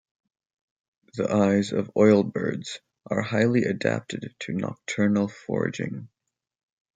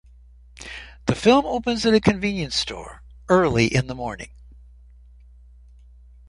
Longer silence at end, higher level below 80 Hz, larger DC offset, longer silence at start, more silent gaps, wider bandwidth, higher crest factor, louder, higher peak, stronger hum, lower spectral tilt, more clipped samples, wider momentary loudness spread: second, 0.9 s vs 2 s; second, -68 dBFS vs -44 dBFS; neither; first, 1.15 s vs 0.6 s; neither; second, 9.2 kHz vs 11.5 kHz; about the same, 20 dB vs 22 dB; second, -25 LUFS vs -21 LUFS; second, -6 dBFS vs -2 dBFS; neither; about the same, -6.5 dB/octave vs -5.5 dB/octave; neither; second, 14 LU vs 20 LU